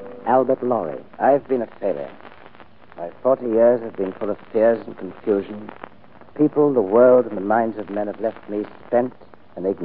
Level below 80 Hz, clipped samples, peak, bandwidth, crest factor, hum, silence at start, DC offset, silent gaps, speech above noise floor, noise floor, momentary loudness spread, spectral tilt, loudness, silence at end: -64 dBFS; under 0.1%; -4 dBFS; 4.6 kHz; 18 dB; none; 0 s; 0.6%; none; 28 dB; -47 dBFS; 18 LU; -12 dB/octave; -20 LUFS; 0 s